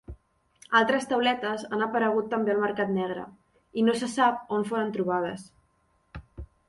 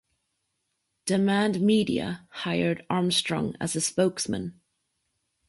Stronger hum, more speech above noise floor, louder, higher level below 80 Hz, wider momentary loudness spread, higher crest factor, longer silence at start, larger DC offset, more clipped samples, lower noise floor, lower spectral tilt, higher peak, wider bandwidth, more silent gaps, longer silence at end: neither; second, 42 dB vs 52 dB; about the same, -26 LUFS vs -26 LUFS; first, -54 dBFS vs -60 dBFS; first, 20 LU vs 11 LU; about the same, 20 dB vs 18 dB; second, 0.1 s vs 1.05 s; neither; neither; second, -69 dBFS vs -78 dBFS; about the same, -5 dB/octave vs -4.5 dB/octave; about the same, -8 dBFS vs -10 dBFS; about the same, 11.5 kHz vs 11.5 kHz; neither; second, 0.25 s vs 0.95 s